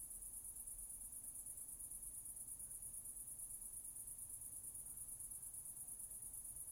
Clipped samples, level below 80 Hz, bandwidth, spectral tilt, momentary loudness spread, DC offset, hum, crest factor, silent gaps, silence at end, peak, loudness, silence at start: under 0.1%; -68 dBFS; over 20 kHz; -1.5 dB/octave; 1 LU; under 0.1%; none; 16 dB; none; 0 s; -36 dBFS; -49 LUFS; 0 s